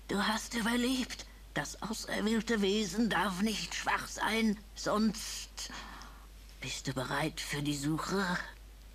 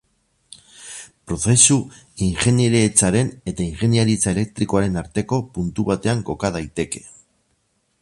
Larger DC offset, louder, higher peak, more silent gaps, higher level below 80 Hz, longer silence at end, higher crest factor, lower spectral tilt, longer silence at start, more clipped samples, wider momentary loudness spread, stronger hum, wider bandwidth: neither; second, -34 LUFS vs -19 LUFS; second, -18 dBFS vs 0 dBFS; neither; second, -52 dBFS vs -42 dBFS; second, 0 s vs 0.95 s; about the same, 18 dB vs 20 dB; about the same, -4 dB/octave vs -4.5 dB/octave; second, 0 s vs 0.8 s; neither; second, 14 LU vs 17 LU; neither; first, 14 kHz vs 11.5 kHz